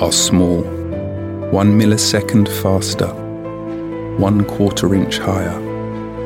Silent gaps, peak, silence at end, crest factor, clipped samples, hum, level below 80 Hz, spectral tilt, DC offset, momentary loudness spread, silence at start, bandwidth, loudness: none; 0 dBFS; 0 s; 16 dB; under 0.1%; none; -40 dBFS; -5 dB/octave; under 0.1%; 13 LU; 0 s; 18 kHz; -16 LUFS